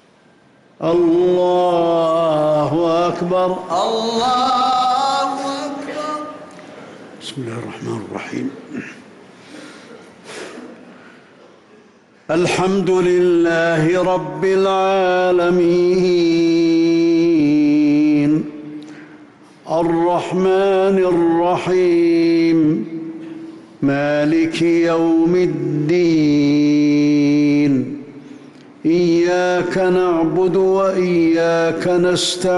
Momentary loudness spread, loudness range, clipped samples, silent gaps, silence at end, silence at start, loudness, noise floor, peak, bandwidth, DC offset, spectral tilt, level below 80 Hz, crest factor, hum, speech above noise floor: 16 LU; 13 LU; under 0.1%; none; 0 s; 0.8 s; -16 LUFS; -51 dBFS; -8 dBFS; 11.5 kHz; under 0.1%; -6 dB/octave; -54 dBFS; 8 dB; none; 36 dB